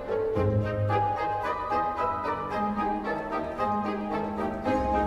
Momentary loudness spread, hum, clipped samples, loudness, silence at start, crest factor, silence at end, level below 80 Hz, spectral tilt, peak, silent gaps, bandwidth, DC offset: 4 LU; none; under 0.1%; -28 LUFS; 0 s; 14 dB; 0 s; -46 dBFS; -8 dB/octave; -14 dBFS; none; 12 kHz; under 0.1%